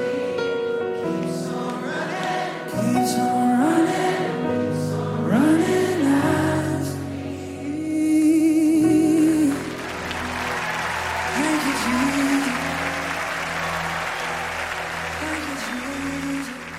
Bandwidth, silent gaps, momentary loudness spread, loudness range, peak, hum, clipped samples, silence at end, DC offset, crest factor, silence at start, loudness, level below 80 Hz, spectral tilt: 16 kHz; none; 10 LU; 5 LU; -6 dBFS; none; under 0.1%; 0 s; under 0.1%; 16 dB; 0 s; -22 LUFS; -54 dBFS; -5 dB/octave